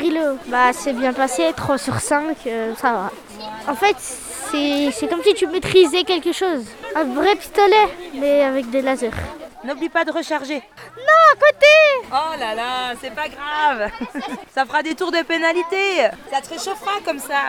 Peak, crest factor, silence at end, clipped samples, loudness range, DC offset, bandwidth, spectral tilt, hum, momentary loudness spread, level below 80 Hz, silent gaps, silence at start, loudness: 0 dBFS; 18 dB; 0 s; under 0.1%; 6 LU; under 0.1%; 18.5 kHz; -3.5 dB/octave; none; 14 LU; -50 dBFS; none; 0 s; -18 LUFS